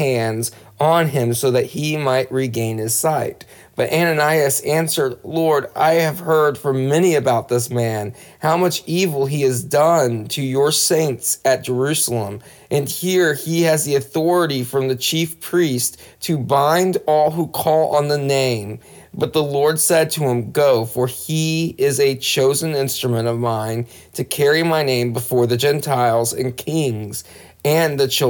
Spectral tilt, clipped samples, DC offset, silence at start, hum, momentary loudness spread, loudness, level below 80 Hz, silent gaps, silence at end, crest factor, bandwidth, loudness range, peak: -4.5 dB/octave; under 0.1%; under 0.1%; 0 s; none; 8 LU; -18 LUFS; -58 dBFS; none; 0 s; 14 dB; over 20 kHz; 2 LU; -4 dBFS